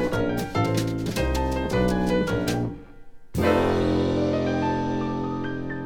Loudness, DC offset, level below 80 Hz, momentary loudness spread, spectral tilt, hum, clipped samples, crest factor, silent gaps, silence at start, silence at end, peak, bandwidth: -25 LUFS; under 0.1%; -38 dBFS; 7 LU; -6.5 dB/octave; none; under 0.1%; 16 dB; none; 0 s; 0 s; -8 dBFS; 18 kHz